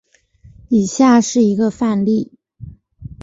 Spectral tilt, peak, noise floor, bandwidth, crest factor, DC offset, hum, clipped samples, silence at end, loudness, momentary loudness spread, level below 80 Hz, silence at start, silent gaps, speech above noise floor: -5.5 dB/octave; -2 dBFS; -48 dBFS; 8 kHz; 14 dB; under 0.1%; none; under 0.1%; 0 s; -15 LUFS; 7 LU; -48 dBFS; 0.7 s; none; 34 dB